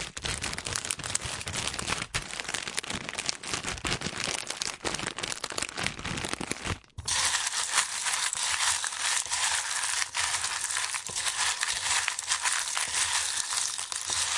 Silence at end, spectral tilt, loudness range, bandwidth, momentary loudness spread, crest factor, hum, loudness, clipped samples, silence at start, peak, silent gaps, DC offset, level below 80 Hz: 0 s; 0 dB/octave; 5 LU; 11.5 kHz; 7 LU; 28 dB; none; -29 LUFS; under 0.1%; 0 s; -4 dBFS; none; under 0.1%; -54 dBFS